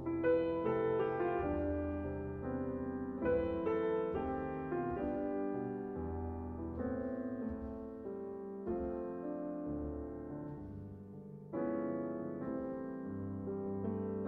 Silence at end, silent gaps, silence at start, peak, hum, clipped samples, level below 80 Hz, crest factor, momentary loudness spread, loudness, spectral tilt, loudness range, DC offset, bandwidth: 0 s; none; 0 s; -22 dBFS; none; under 0.1%; -56 dBFS; 16 dB; 10 LU; -39 LUFS; -8 dB/octave; 6 LU; under 0.1%; 4.3 kHz